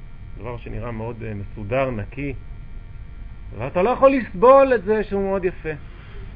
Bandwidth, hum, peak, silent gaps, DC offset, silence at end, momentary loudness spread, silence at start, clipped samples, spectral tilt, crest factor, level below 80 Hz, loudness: 5 kHz; none; -2 dBFS; none; 0.1%; 0 s; 26 LU; 0 s; under 0.1%; -10.5 dB/octave; 18 dB; -36 dBFS; -20 LUFS